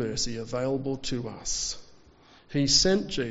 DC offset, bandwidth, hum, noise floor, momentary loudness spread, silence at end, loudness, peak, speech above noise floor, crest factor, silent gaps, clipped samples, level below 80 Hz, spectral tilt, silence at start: under 0.1%; 8 kHz; none; -56 dBFS; 12 LU; 0 s; -27 LUFS; -10 dBFS; 28 dB; 20 dB; none; under 0.1%; -46 dBFS; -4 dB/octave; 0 s